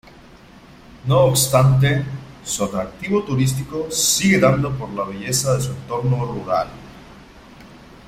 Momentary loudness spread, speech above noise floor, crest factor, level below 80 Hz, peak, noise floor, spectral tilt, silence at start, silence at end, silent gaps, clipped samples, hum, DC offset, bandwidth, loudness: 12 LU; 26 dB; 18 dB; -44 dBFS; -2 dBFS; -44 dBFS; -4.5 dB/octave; 0.55 s; 0.3 s; none; under 0.1%; none; under 0.1%; 16 kHz; -19 LUFS